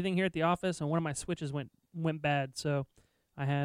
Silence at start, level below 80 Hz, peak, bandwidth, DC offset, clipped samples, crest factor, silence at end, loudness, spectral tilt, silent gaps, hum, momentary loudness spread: 0 s; -62 dBFS; -14 dBFS; 14.5 kHz; under 0.1%; under 0.1%; 18 dB; 0 s; -34 LUFS; -6 dB/octave; none; none; 8 LU